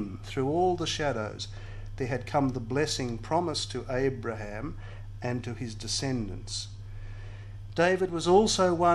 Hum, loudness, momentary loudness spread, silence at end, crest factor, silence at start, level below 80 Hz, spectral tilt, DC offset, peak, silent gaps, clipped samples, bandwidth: none; -29 LUFS; 19 LU; 0 s; 20 dB; 0 s; -44 dBFS; -4.5 dB/octave; under 0.1%; -10 dBFS; none; under 0.1%; 12.5 kHz